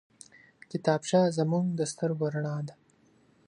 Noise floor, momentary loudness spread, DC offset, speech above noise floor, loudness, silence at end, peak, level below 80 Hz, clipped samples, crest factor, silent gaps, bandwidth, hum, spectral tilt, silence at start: -64 dBFS; 12 LU; under 0.1%; 36 dB; -29 LUFS; 0.75 s; -10 dBFS; -74 dBFS; under 0.1%; 20 dB; none; 11 kHz; none; -6 dB/octave; 0.7 s